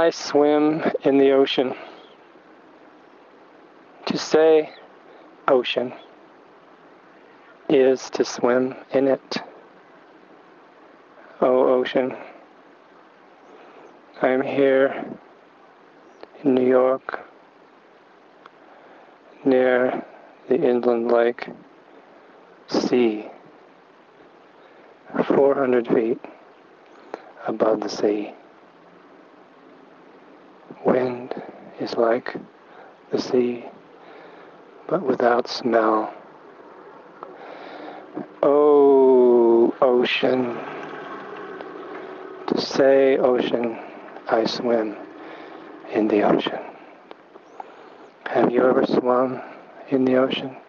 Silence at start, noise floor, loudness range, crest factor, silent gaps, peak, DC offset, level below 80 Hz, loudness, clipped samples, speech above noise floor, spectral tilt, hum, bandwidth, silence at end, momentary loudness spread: 0 s; -51 dBFS; 8 LU; 20 dB; none; -4 dBFS; under 0.1%; -72 dBFS; -20 LUFS; under 0.1%; 32 dB; -5.5 dB/octave; none; 7.2 kHz; 0.1 s; 21 LU